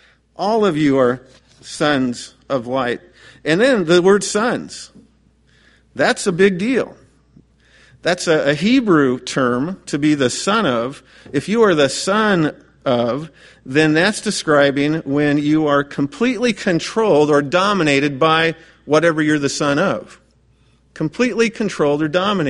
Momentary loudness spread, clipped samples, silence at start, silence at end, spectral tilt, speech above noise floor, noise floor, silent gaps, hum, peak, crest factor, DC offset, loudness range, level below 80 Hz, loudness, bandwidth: 10 LU; under 0.1%; 0.4 s; 0 s; -5 dB/octave; 38 dB; -55 dBFS; none; none; 0 dBFS; 16 dB; under 0.1%; 3 LU; -54 dBFS; -17 LUFS; 11.5 kHz